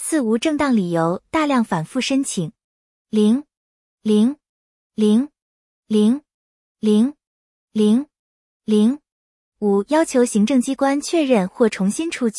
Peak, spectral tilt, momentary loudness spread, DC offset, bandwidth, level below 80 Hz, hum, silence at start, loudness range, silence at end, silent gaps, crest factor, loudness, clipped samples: -4 dBFS; -5.5 dB/octave; 9 LU; under 0.1%; 12 kHz; -60 dBFS; none; 0 s; 3 LU; 0 s; 2.64-3.05 s, 3.57-3.98 s, 4.49-4.90 s, 5.42-5.83 s, 6.34-6.75 s, 7.27-7.68 s, 8.19-8.60 s, 9.12-9.52 s; 16 dB; -19 LUFS; under 0.1%